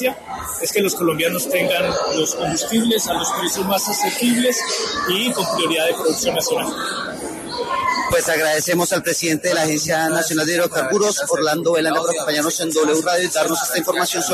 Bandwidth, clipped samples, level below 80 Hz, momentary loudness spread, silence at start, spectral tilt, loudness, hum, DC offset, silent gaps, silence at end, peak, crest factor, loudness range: 14 kHz; under 0.1%; -52 dBFS; 4 LU; 0 s; -2.5 dB/octave; -18 LUFS; none; under 0.1%; none; 0 s; -6 dBFS; 14 dB; 2 LU